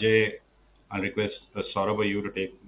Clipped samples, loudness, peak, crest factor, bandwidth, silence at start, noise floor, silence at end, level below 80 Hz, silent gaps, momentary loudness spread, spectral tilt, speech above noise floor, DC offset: under 0.1%; -28 LUFS; -8 dBFS; 20 dB; 4 kHz; 0 s; -56 dBFS; 0 s; -56 dBFS; none; 12 LU; -9.5 dB/octave; 29 dB; under 0.1%